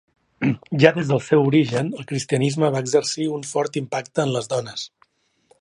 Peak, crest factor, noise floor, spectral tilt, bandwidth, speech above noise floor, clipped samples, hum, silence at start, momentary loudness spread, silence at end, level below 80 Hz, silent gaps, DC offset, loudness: 0 dBFS; 22 dB; -62 dBFS; -5.5 dB/octave; 11.5 kHz; 41 dB; under 0.1%; none; 0.4 s; 10 LU; 0.75 s; -62 dBFS; none; under 0.1%; -21 LUFS